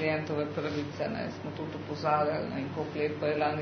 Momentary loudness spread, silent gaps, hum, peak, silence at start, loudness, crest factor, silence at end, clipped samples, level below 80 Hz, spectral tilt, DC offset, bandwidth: 9 LU; none; none; -14 dBFS; 0 s; -32 LUFS; 18 dB; 0 s; under 0.1%; -66 dBFS; -5 dB/octave; under 0.1%; 6.4 kHz